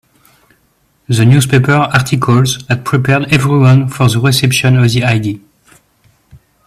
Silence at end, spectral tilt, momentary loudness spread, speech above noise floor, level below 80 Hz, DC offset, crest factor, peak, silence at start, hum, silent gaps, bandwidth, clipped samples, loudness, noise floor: 1.3 s; -5.5 dB/octave; 6 LU; 46 dB; -42 dBFS; under 0.1%; 12 dB; 0 dBFS; 1.1 s; none; none; 14.5 kHz; under 0.1%; -11 LUFS; -56 dBFS